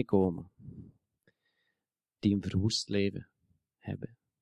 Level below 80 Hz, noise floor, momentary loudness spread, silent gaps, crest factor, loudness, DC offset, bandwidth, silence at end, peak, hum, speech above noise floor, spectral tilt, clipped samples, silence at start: -54 dBFS; -89 dBFS; 20 LU; none; 22 dB; -32 LUFS; under 0.1%; 11 kHz; 0.35 s; -14 dBFS; none; 59 dB; -6 dB/octave; under 0.1%; 0 s